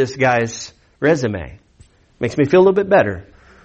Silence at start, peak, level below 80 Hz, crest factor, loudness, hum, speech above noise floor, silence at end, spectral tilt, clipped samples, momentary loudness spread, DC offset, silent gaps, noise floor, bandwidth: 0 s; -4 dBFS; -48 dBFS; 14 dB; -16 LUFS; none; 34 dB; 0.45 s; -6 dB/octave; under 0.1%; 19 LU; under 0.1%; none; -50 dBFS; 8.2 kHz